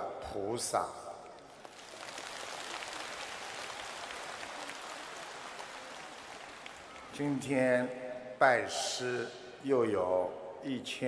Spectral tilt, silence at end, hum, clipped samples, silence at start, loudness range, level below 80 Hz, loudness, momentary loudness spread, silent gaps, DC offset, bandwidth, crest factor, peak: -3.5 dB/octave; 0 s; none; under 0.1%; 0 s; 11 LU; -70 dBFS; -36 LUFS; 17 LU; none; under 0.1%; 11 kHz; 24 dB; -12 dBFS